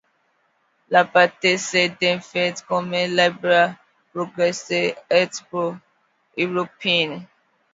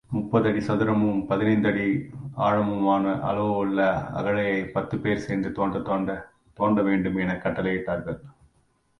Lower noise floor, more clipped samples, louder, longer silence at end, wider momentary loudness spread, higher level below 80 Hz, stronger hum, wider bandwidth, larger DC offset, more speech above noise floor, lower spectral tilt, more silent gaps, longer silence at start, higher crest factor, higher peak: about the same, -66 dBFS vs -66 dBFS; neither; first, -20 LUFS vs -25 LUFS; second, 0.5 s vs 0.7 s; first, 11 LU vs 6 LU; second, -72 dBFS vs -52 dBFS; neither; second, 7.8 kHz vs 9.8 kHz; neither; about the same, 45 dB vs 42 dB; second, -3.5 dB/octave vs -8.5 dB/octave; neither; first, 0.9 s vs 0.1 s; about the same, 22 dB vs 18 dB; first, 0 dBFS vs -8 dBFS